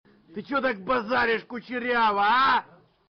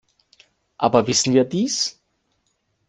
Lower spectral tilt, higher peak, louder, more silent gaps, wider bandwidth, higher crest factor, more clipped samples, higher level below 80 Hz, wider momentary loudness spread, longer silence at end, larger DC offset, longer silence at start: second, -1 dB/octave vs -4 dB/octave; second, -16 dBFS vs -2 dBFS; second, -24 LUFS vs -19 LUFS; neither; second, 6.2 kHz vs 10 kHz; second, 10 dB vs 20 dB; neither; about the same, -60 dBFS vs -60 dBFS; first, 12 LU vs 6 LU; second, 0.45 s vs 0.95 s; neither; second, 0.3 s vs 0.8 s